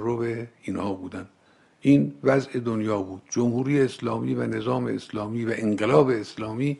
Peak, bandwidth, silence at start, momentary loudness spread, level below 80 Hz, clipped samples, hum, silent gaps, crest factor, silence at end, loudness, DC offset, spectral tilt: -4 dBFS; 11.5 kHz; 0 s; 11 LU; -62 dBFS; under 0.1%; none; none; 20 dB; 0 s; -25 LUFS; under 0.1%; -7 dB/octave